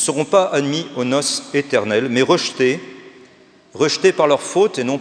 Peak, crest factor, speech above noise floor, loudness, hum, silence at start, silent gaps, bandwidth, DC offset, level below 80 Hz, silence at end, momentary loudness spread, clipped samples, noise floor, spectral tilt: 0 dBFS; 18 dB; 32 dB; -17 LUFS; none; 0 s; none; 10.5 kHz; under 0.1%; -74 dBFS; 0 s; 5 LU; under 0.1%; -49 dBFS; -3.5 dB/octave